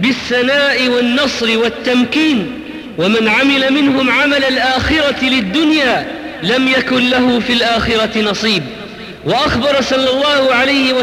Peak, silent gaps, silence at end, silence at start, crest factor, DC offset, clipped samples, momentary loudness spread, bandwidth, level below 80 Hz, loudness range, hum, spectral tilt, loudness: -2 dBFS; none; 0 s; 0 s; 10 dB; under 0.1%; under 0.1%; 7 LU; 15.5 kHz; -38 dBFS; 2 LU; none; -4 dB/octave; -12 LUFS